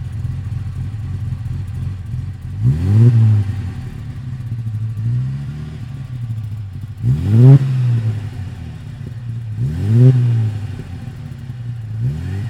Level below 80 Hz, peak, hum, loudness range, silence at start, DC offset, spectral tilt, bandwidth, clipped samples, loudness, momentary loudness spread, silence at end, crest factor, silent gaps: -36 dBFS; 0 dBFS; none; 7 LU; 0 s; under 0.1%; -9.5 dB/octave; 5.6 kHz; under 0.1%; -17 LUFS; 18 LU; 0 s; 16 dB; none